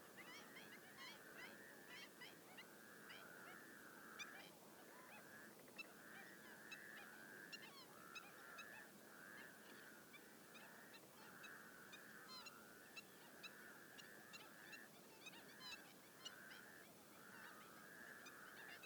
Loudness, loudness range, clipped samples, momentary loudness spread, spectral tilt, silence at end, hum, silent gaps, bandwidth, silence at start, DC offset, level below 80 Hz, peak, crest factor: -59 LUFS; 2 LU; under 0.1%; 5 LU; -2 dB/octave; 0 s; none; none; over 20 kHz; 0 s; under 0.1%; under -90 dBFS; -40 dBFS; 22 dB